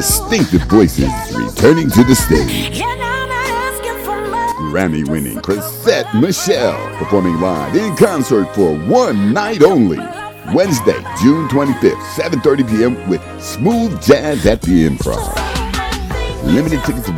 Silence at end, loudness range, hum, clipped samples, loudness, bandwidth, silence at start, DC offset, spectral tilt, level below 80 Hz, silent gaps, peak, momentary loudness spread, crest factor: 0 s; 3 LU; none; 0.5%; -14 LUFS; 18.5 kHz; 0 s; under 0.1%; -5.5 dB/octave; -28 dBFS; none; 0 dBFS; 9 LU; 14 dB